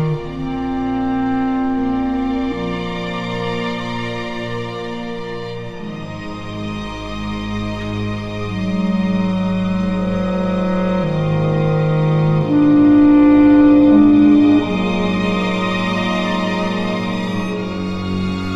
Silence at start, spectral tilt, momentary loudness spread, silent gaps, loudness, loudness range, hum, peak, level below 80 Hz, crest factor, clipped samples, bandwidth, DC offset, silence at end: 0 s; -7.5 dB/octave; 16 LU; none; -17 LUFS; 14 LU; none; -2 dBFS; -38 dBFS; 14 dB; under 0.1%; 8 kHz; under 0.1%; 0 s